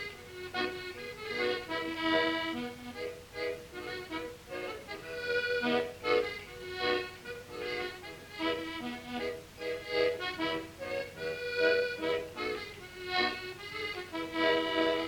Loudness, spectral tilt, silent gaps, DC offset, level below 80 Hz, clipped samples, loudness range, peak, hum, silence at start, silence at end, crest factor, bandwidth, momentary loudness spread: -34 LUFS; -4 dB/octave; none; under 0.1%; -62 dBFS; under 0.1%; 4 LU; -14 dBFS; none; 0 s; 0 s; 22 dB; 19 kHz; 12 LU